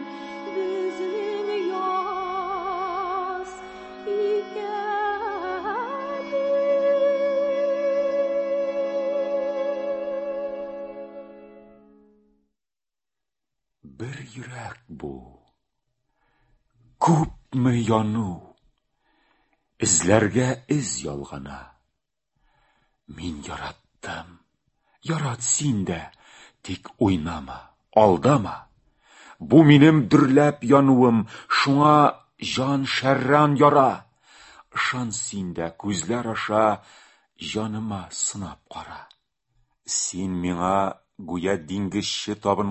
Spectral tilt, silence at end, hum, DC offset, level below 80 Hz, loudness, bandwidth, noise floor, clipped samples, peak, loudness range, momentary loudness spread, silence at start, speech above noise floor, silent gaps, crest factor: -5 dB/octave; 0 s; none; under 0.1%; -52 dBFS; -22 LUFS; 8.6 kHz; under -90 dBFS; under 0.1%; -2 dBFS; 20 LU; 20 LU; 0 s; over 69 dB; none; 22 dB